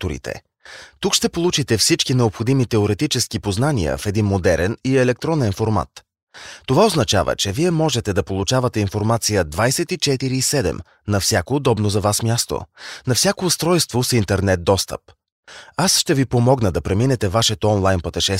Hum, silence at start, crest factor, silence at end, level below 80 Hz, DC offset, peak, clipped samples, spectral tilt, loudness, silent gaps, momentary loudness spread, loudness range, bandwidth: none; 0 s; 16 dB; 0 s; -40 dBFS; under 0.1%; -2 dBFS; under 0.1%; -4.5 dB/octave; -18 LUFS; 6.22-6.27 s, 15.32-15.43 s; 9 LU; 1 LU; 16 kHz